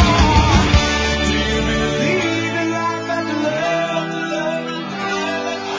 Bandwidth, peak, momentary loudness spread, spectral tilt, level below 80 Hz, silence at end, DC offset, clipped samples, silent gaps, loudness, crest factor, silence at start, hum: 7.6 kHz; 0 dBFS; 9 LU; -5 dB/octave; -24 dBFS; 0 s; under 0.1%; under 0.1%; none; -18 LUFS; 16 dB; 0 s; none